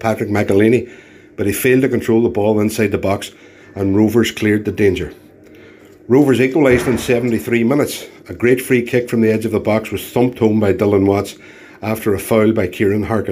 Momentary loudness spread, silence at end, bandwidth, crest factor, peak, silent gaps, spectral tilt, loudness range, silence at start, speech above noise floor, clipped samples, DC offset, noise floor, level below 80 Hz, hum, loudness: 9 LU; 0 s; 16 kHz; 14 dB; 0 dBFS; none; -6.5 dB/octave; 2 LU; 0 s; 27 dB; under 0.1%; under 0.1%; -41 dBFS; -46 dBFS; none; -15 LUFS